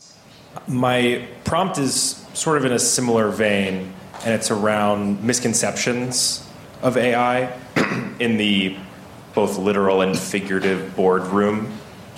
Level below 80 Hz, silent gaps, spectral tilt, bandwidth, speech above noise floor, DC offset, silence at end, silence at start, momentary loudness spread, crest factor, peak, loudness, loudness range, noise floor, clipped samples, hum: -54 dBFS; none; -3.5 dB/octave; 16 kHz; 26 dB; under 0.1%; 0 s; 0.4 s; 9 LU; 14 dB; -6 dBFS; -20 LUFS; 1 LU; -46 dBFS; under 0.1%; none